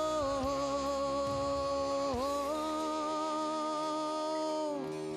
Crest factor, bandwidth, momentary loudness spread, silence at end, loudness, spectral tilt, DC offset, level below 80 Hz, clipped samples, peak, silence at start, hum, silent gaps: 10 dB; 15 kHz; 2 LU; 0 s; -34 LUFS; -4.5 dB/octave; under 0.1%; -56 dBFS; under 0.1%; -22 dBFS; 0 s; none; none